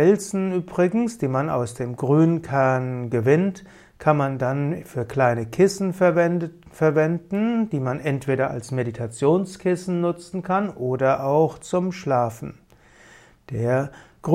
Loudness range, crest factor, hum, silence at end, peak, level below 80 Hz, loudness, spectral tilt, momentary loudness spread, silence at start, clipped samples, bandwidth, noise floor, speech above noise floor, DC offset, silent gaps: 3 LU; 18 dB; none; 0 s; -4 dBFS; -56 dBFS; -22 LUFS; -7.5 dB/octave; 8 LU; 0 s; under 0.1%; 15 kHz; -52 dBFS; 30 dB; under 0.1%; none